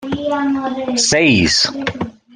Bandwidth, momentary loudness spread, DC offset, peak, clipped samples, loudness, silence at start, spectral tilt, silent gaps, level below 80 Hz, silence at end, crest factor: 11 kHz; 11 LU; under 0.1%; -2 dBFS; under 0.1%; -15 LUFS; 0 s; -3 dB/octave; none; -44 dBFS; 0.25 s; 14 dB